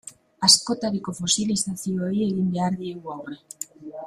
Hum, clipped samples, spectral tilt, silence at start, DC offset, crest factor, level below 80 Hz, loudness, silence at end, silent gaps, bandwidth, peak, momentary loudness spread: none; under 0.1%; -3.5 dB/octave; 0.05 s; under 0.1%; 24 dB; -60 dBFS; -22 LUFS; 0 s; none; 15 kHz; -2 dBFS; 20 LU